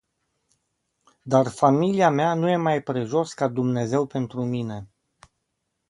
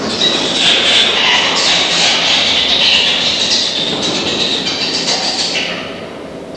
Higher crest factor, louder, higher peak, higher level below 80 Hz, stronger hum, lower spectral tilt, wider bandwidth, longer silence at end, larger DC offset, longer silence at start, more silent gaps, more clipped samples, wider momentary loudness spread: first, 20 dB vs 14 dB; second, -23 LUFS vs -10 LUFS; second, -4 dBFS vs 0 dBFS; second, -64 dBFS vs -46 dBFS; neither; first, -7 dB/octave vs -1 dB/octave; about the same, 11.5 kHz vs 11 kHz; first, 1.05 s vs 0 s; second, under 0.1% vs 0.1%; first, 1.25 s vs 0 s; neither; neither; about the same, 8 LU vs 8 LU